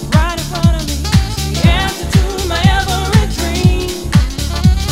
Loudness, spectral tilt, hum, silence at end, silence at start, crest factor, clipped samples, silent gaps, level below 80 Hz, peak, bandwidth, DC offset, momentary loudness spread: -14 LUFS; -5 dB/octave; none; 0 s; 0 s; 12 dB; 0.2%; none; -18 dBFS; 0 dBFS; 16.5 kHz; under 0.1%; 5 LU